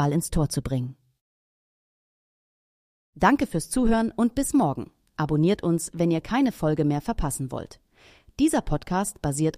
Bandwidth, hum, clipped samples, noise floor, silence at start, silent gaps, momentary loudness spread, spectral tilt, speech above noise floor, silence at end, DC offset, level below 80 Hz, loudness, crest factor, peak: 15.5 kHz; none; under 0.1%; -55 dBFS; 0 s; 1.21-3.13 s; 9 LU; -6 dB/octave; 31 dB; 0 s; under 0.1%; -40 dBFS; -25 LUFS; 18 dB; -6 dBFS